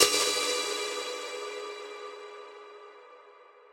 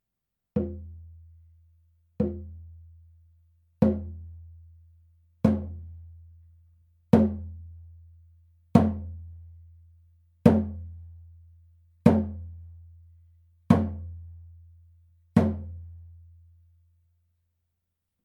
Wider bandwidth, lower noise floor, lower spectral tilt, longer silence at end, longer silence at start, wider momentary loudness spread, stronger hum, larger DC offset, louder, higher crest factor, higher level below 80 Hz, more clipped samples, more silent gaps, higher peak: first, 16 kHz vs 10 kHz; second, -55 dBFS vs -85 dBFS; second, 1 dB/octave vs -9.5 dB/octave; second, 0.1 s vs 2.2 s; second, 0 s vs 0.55 s; second, 23 LU vs 26 LU; neither; neither; second, -30 LUFS vs -26 LUFS; about the same, 28 dB vs 28 dB; second, -74 dBFS vs -48 dBFS; neither; neither; second, -6 dBFS vs -2 dBFS